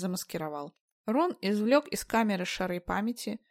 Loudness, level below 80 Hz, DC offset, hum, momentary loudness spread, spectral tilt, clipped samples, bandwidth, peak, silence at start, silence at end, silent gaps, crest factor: -30 LUFS; -58 dBFS; under 0.1%; none; 12 LU; -5 dB/octave; under 0.1%; 16 kHz; -10 dBFS; 0 s; 0.15 s; 0.81-1.04 s; 20 dB